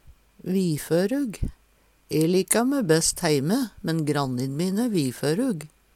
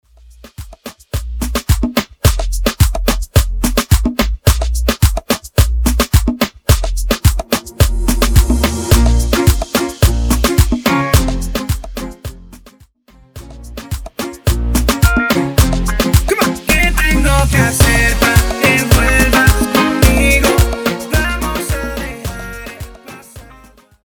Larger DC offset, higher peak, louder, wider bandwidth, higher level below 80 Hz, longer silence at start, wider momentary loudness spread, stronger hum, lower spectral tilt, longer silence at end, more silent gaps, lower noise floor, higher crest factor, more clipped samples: neither; second, -4 dBFS vs 0 dBFS; second, -24 LUFS vs -14 LUFS; second, 18 kHz vs over 20 kHz; second, -46 dBFS vs -18 dBFS; second, 0.1 s vs 0.45 s; second, 8 LU vs 15 LU; neither; about the same, -5 dB/octave vs -4.5 dB/octave; second, 0.3 s vs 0.75 s; neither; first, -61 dBFS vs -47 dBFS; first, 22 dB vs 14 dB; neither